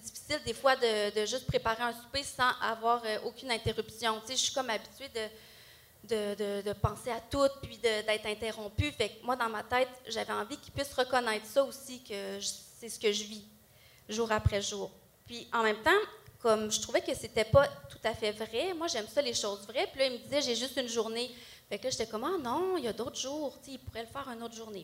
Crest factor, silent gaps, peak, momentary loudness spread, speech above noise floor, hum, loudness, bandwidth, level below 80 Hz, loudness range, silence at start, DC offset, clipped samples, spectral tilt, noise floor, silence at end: 22 dB; none; -12 dBFS; 12 LU; 27 dB; none; -33 LUFS; 16 kHz; -56 dBFS; 5 LU; 0 s; under 0.1%; under 0.1%; -3.5 dB/octave; -60 dBFS; 0 s